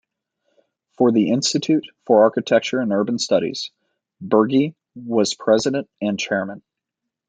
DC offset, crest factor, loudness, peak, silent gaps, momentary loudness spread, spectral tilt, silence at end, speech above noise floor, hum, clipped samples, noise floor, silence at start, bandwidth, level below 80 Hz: under 0.1%; 18 dB; -19 LUFS; -2 dBFS; none; 10 LU; -4.5 dB/octave; 0.7 s; 64 dB; none; under 0.1%; -83 dBFS; 1 s; 9.4 kHz; -64 dBFS